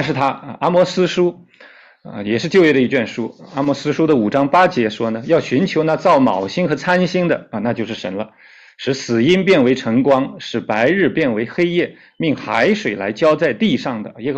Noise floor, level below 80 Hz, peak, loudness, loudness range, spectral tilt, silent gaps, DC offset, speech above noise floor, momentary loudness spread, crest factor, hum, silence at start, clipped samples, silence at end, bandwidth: -45 dBFS; -56 dBFS; -2 dBFS; -17 LUFS; 2 LU; -6 dB/octave; none; under 0.1%; 29 dB; 11 LU; 14 dB; none; 0 s; under 0.1%; 0 s; 8.2 kHz